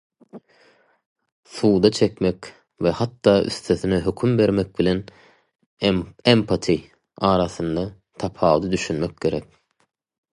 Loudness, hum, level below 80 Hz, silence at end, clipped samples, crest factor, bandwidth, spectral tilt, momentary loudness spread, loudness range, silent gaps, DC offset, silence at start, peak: -21 LUFS; none; -46 dBFS; 0.9 s; under 0.1%; 20 dB; 11.5 kHz; -6 dB/octave; 10 LU; 3 LU; 1.06-1.16 s, 1.32-1.43 s, 5.66-5.77 s; under 0.1%; 0.35 s; -2 dBFS